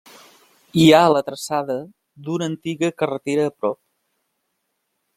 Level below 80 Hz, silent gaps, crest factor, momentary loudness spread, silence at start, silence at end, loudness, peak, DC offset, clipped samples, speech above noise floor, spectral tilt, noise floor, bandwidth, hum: -60 dBFS; none; 20 dB; 15 LU; 0.75 s; 1.45 s; -19 LUFS; -2 dBFS; under 0.1%; under 0.1%; 55 dB; -5.5 dB/octave; -74 dBFS; 15.5 kHz; none